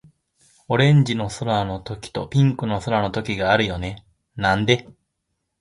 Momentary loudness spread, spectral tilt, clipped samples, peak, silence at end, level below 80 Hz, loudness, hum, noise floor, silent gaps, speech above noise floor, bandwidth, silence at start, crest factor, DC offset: 14 LU; -6 dB/octave; under 0.1%; -2 dBFS; 0.7 s; -46 dBFS; -21 LUFS; none; -76 dBFS; none; 56 dB; 11 kHz; 0.7 s; 20 dB; under 0.1%